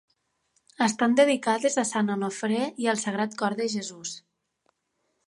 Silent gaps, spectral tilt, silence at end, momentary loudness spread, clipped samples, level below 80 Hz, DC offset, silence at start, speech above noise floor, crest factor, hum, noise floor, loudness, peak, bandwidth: none; -4 dB/octave; 1.1 s; 12 LU; under 0.1%; -78 dBFS; under 0.1%; 0.8 s; 51 dB; 18 dB; none; -76 dBFS; -26 LUFS; -8 dBFS; 11.5 kHz